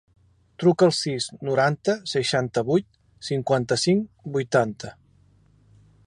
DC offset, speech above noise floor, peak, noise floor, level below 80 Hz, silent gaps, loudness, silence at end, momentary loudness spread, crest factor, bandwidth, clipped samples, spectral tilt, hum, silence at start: under 0.1%; 35 dB; -6 dBFS; -58 dBFS; -60 dBFS; none; -23 LUFS; 1.15 s; 9 LU; 18 dB; 11 kHz; under 0.1%; -5 dB/octave; none; 0.6 s